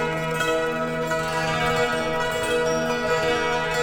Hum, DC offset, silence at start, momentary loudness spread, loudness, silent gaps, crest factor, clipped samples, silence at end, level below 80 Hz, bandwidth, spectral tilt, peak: none; under 0.1%; 0 s; 3 LU; -23 LUFS; none; 12 dB; under 0.1%; 0 s; -46 dBFS; over 20 kHz; -4 dB/octave; -10 dBFS